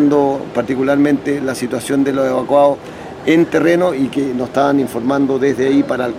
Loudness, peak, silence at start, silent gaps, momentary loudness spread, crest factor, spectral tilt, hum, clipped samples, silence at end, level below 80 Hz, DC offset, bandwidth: -15 LUFS; -2 dBFS; 0 s; none; 7 LU; 14 dB; -6 dB/octave; none; under 0.1%; 0 s; -50 dBFS; under 0.1%; 15 kHz